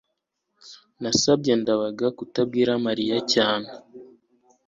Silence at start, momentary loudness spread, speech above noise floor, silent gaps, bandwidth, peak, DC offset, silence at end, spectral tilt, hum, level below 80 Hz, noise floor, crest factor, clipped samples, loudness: 0.65 s; 9 LU; 56 dB; none; 7.8 kHz; -6 dBFS; under 0.1%; 0.6 s; -4 dB/octave; none; -62 dBFS; -78 dBFS; 20 dB; under 0.1%; -23 LUFS